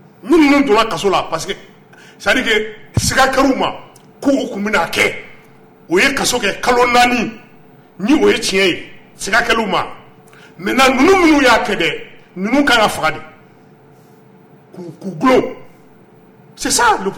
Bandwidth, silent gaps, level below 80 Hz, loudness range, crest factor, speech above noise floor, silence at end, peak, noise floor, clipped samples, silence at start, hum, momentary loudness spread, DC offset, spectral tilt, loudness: 19 kHz; none; -40 dBFS; 6 LU; 14 dB; 31 dB; 0 s; -2 dBFS; -45 dBFS; under 0.1%; 0.25 s; none; 15 LU; under 0.1%; -3.5 dB/octave; -14 LUFS